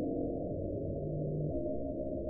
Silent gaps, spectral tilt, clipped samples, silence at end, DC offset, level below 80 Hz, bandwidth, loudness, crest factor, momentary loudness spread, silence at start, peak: none; -16.5 dB/octave; under 0.1%; 0 s; under 0.1%; -48 dBFS; 0.9 kHz; -37 LUFS; 12 dB; 2 LU; 0 s; -24 dBFS